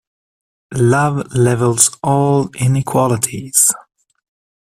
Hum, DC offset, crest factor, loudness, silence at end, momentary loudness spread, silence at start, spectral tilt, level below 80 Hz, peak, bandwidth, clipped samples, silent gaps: none; under 0.1%; 16 dB; -14 LUFS; 0.85 s; 5 LU; 0.7 s; -5 dB/octave; -48 dBFS; 0 dBFS; 16 kHz; under 0.1%; none